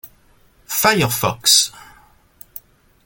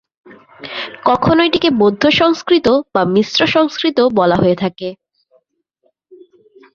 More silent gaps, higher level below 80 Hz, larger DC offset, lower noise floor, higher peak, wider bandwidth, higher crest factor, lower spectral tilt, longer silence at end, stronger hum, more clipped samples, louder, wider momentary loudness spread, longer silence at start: neither; about the same, -52 dBFS vs -48 dBFS; neither; second, -54 dBFS vs -63 dBFS; about the same, 0 dBFS vs -2 dBFS; first, 17 kHz vs 7.2 kHz; first, 20 dB vs 14 dB; second, -2 dB/octave vs -5.5 dB/octave; second, 0.45 s vs 1.8 s; neither; neither; about the same, -15 LUFS vs -13 LUFS; first, 24 LU vs 13 LU; second, 0.05 s vs 0.3 s